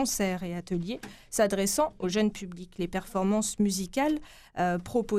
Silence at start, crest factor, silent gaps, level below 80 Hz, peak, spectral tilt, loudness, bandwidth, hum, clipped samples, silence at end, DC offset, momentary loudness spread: 0 s; 18 dB; none; -52 dBFS; -12 dBFS; -4.5 dB/octave; -29 LUFS; 15.5 kHz; none; under 0.1%; 0 s; under 0.1%; 10 LU